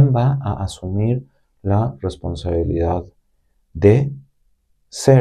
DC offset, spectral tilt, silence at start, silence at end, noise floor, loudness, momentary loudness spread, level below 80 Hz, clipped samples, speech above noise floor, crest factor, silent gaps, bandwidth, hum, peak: under 0.1%; -7.5 dB/octave; 0 s; 0 s; -63 dBFS; -20 LUFS; 12 LU; -38 dBFS; under 0.1%; 46 dB; 18 dB; none; 12 kHz; none; 0 dBFS